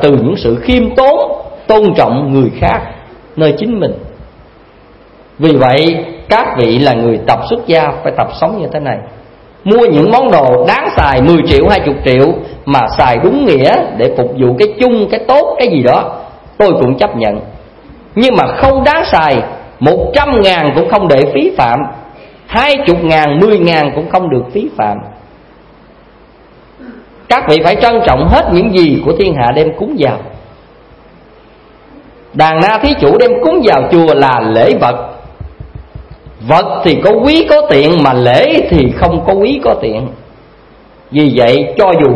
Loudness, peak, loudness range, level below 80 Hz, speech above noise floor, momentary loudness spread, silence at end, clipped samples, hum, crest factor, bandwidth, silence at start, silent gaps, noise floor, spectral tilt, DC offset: -9 LUFS; 0 dBFS; 5 LU; -30 dBFS; 31 dB; 9 LU; 0 s; 0.6%; none; 10 dB; 11 kHz; 0 s; none; -40 dBFS; -7.5 dB/octave; under 0.1%